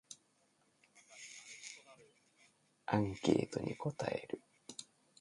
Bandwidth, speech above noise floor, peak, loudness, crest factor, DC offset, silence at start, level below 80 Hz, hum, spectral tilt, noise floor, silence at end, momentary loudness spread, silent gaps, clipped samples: 11.5 kHz; 38 dB; -16 dBFS; -40 LUFS; 26 dB; under 0.1%; 0.1 s; -68 dBFS; none; -5.5 dB/octave; -75 dBFS; 0.35 s; 20 LU; none; under 0.1%